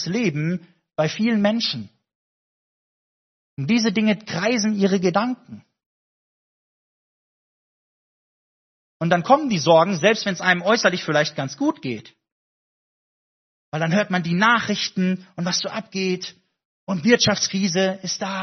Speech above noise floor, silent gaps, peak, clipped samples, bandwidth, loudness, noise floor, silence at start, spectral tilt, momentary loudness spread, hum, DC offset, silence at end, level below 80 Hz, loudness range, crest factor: over 69 dB; 2.15-3.57 s, 5.86-9.00 s, 12.32-13.72 s, 16.65-16.87 s; 0 dBFS; under 0.1%; 6.4 kHz; -21 LUFS; under -90 dBFS; 0 s; -3.5 dB/octave; 13 LU; none; under 0.1%; 0 s; -64 dBFS; 7 LU; 22 dB